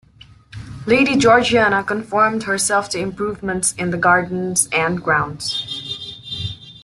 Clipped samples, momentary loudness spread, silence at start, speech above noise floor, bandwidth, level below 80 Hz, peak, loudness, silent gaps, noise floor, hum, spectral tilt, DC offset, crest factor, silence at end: under 0.1%; 15 LU; 0.55 s; 29 dB; 12.5 kHz; -48 dBFS; -2 dBFS; -17 LUFS; none; -46 dBFS; none; -3.5 dB/octave; under 0.1%; 18 dB; 0.05 s